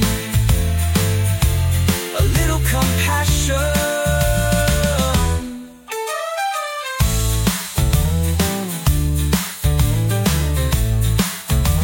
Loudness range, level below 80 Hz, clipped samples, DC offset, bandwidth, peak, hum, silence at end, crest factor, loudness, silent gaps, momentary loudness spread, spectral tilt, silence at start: 3 LU; -24 dBFS; under 0.1%; under 0.1%; 17 kHz; -4 dBFS; none; 0 s; 14 dB; -18 LUFS; none; 5 LU; -4.5 dB/octave; 0 s